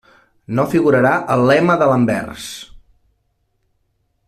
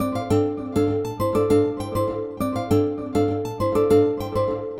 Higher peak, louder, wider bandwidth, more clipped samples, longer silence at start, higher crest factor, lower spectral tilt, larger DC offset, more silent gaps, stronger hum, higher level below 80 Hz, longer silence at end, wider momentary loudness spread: first, -2 dBFS vs -6 dBFS; first, -15 LUFS vs -22 LUFS; second, 14.5 kHz vs 16.5 kHz; neither; first, 0.5 s vs 0 s; about the same, 14 dB vs 14 dB; about the same, -6.5 dB/octave vs -7.5 dB/octave; neither; neither; neither; second, -52 dBFS vs -46 dBFS; first, 1.5 s vs 0 s; first, 16 LU vs 7 LU